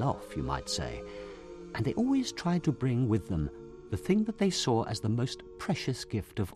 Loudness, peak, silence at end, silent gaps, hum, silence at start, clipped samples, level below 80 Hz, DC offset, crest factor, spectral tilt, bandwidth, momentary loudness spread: -32 LUFS; -14 dBFS; 0 s; none; none; 0 s; under 0.1%; -50 dBFS; under 0.1%; 16 dB; -6 dB/octave; 13.5 kHz; 12 LU